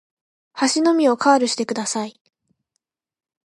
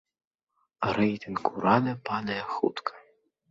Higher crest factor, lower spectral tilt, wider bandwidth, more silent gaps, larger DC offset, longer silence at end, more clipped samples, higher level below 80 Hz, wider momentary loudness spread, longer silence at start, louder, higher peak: about the same, 20 dB vs 22 dB; second, -2.5 dB/octave vs -7.5 dB/octave; first, 11.5 kHz vs 7.6 kHz; neither; neither; first, 1.35 s vs 0.5 s; neither; second, -76 dBFS vs -62 dBFS; first, 12 LU vs 8 LU; second, 0.55 s vs 0.8 s; first, -19 LUFS vs -28 LUFS; first, -2 dBFS vs -6 dBFS